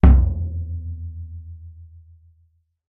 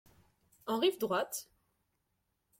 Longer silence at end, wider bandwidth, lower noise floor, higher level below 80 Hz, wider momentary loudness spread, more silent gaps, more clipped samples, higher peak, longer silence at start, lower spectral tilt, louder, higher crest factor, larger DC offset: about the same, 1.05 s vs 1.15 s; second, 3.1 kHz vs 16.5 kHz; second, -62 dBFS vs -82 dBFS; first, -22 dBFS vs -78 dBFS; first, 24 LU vs 12 LU; neither; neither; first, 0 dBFS vs -20 dBFS; second, 0.05 s vs 0.65 s; first, -12 dB/octave vs -3.5 dB/octave; first, -23 LUFS vs -34 LUFS; about the same, 20 dB vs 18 dB; neither